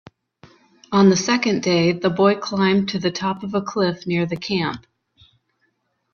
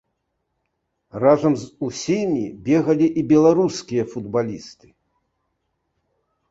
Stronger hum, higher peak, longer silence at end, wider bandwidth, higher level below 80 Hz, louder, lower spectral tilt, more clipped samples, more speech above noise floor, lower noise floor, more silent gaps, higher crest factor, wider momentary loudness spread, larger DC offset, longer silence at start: neither; about the same, -2 dBFS vs -2 dBFS; second, 1.35 s vs 1.8 s; second, 7 kHz vs 8 kHz; about the same, -58 dBFS vs -58 dBFS; about the same, -20 LUFS vs -20 LUFS; about the same, -5.5 dB/octave vs -6.5 dB/octave; neither; second, 50 dB vs 55 dB; second, -69 dBFS vs -75 dBFS; neither; about the same, 18 dB vs 20 dB; second, 9 LU vs 12 LU; neither; second, 0.9 s vs 1.15 s